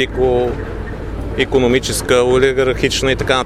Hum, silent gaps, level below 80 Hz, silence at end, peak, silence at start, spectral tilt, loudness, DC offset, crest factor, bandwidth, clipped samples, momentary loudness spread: none; none; -28 dBFS; 0 s; 0 dBFS; 0 s; -4.5 dB/octave; -15 LUFS; under 0.1%; 16 dB; 15 kHz; under 0.1%; 13 LU